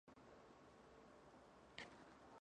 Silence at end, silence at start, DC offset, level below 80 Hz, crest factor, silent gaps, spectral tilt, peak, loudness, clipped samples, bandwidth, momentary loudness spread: 0 s; 0.05 s; under 0.1%; -80 dBFS; 30 dB; none; -4 dB/octave; -34 dBFS; -63 LUFS; under 0.1%; 10 kHz; 8 LU